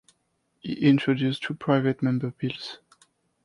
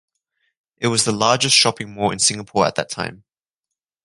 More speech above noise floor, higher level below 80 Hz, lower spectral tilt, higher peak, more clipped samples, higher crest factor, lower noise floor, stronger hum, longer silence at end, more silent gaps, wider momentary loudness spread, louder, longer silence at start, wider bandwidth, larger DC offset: second, 49 dB vs 66 dB; second, -66 dBFS vs -56 dBFS; first, -7.5 dB/octave vs -2.5 dB/octave; second, -8 dBFS vs 0 dBFS; neither; about the same, 20 dB vs 20 dB; second, -73 dBFS vs -84 dBFS; neither; second, 0.7 s vs 0.9 s; neither; first, 16 LU vs 12 LU; second, -25 LUFS vs -17 LUFS; second, 0.65 s vs 0.8 s; about the same, 11 kHz vs 11.5 kHz; neither